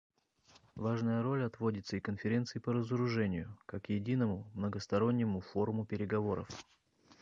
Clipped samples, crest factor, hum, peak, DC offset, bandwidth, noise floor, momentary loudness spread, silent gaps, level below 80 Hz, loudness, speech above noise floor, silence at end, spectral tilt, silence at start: under 0.1%; 18 dB; none; -18 dBFS; under 0.1%; 7.6 kHz; -67 dBFS; 8 LU; none; -62 dBFS; -36 LUFS; 32 dB; 0.6 s; -7.5 dB/octave; 0.75 s